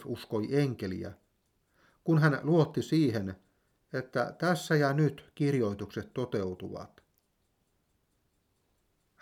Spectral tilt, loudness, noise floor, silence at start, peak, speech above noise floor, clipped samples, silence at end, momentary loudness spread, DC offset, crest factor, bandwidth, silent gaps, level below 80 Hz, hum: -7 dB/octave; -30 LUFS; -75 dBFS; 0 s; -12 dBFS; 46 dB; under 0.1%; 2.35 s; 14 LU; under 0.1%; 20 dB; 15 kHz; none; -70 dBFS; none